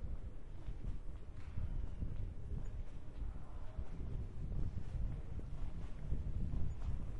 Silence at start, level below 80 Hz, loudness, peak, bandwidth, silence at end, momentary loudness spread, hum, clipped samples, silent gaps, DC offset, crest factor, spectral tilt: 0 s; -44 dBFS; -47 LUFS; -24 dBFS; 4.5 kHz; 0 s; 8 LU; none; under 0.1%; none; under 0.1%; 16 dB; -8.5 dB/octave